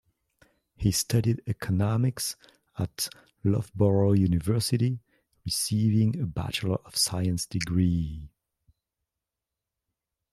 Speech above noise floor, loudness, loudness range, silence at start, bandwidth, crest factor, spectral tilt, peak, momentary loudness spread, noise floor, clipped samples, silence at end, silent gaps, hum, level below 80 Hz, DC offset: 62 dB; -27 LUFS; 4 LU; 0.8 s; 15 kHz; 18 dB; -5.5 dB/octave; -10 dBFS; 10 LU; -88 dBFS; under 0.1%; 2.05 s; none; none; -50 dBFS; under 0.1%